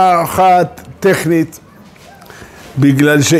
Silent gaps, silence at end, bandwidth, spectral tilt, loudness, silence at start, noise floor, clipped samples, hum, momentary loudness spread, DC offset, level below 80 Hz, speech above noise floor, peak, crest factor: none; 0 s; 16 kHz; -5.5 dB/octave; -12 LUFS; 0 s; -39 dBFS; under 0.1%; none; 10 LU; under 0.1%; -46 dBFS; 28 dB; 0 dBFS; 12 dB